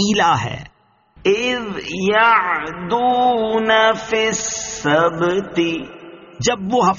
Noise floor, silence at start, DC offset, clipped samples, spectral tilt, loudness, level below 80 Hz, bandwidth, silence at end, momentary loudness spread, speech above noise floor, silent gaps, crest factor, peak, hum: -53 dBFS; 0 s; under 0.1%; under 0.1%; -2.5 dB/octave; -17 LUFS; -50 dBFS; 7.4 kHz; 0 s; 9 LU; 36 dB; none; 16 dB; -2 dBFS; none